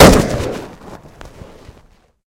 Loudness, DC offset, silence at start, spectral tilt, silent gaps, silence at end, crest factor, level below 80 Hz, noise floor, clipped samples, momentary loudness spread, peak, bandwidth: -14 LUFS; under 0.1%; 0 s; -5 dB/octave; none; 1 s; 14 dB; -26 dBFS; -49 dBFS; 0.7%; 26 LU; 0 dBFS; over 20 kHz